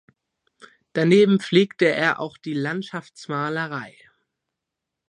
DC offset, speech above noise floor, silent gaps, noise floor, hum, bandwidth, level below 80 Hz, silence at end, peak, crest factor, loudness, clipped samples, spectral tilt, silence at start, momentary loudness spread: under 0.1%; 63 dB; none; -84 dBFS; none; 10.5 kHz; -72 dBFS; 1.2 s; -4 dBFS; 20 dB; -21 LUFS; under 0.1%; -6.5 dB/octave; 0.95 s; 16 LU